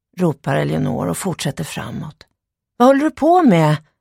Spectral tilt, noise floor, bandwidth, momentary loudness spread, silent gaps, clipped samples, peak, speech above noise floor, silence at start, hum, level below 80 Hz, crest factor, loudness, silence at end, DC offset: -6.5 dB/octave; -75 dBFS; 16 kHz; 14 LU; none; under 0.1%; -2 dBFS; 59 dB; 0.15 s; none; -50 dBFS; 16 dB; -17 LUFS; 0.2 s; under 0.1%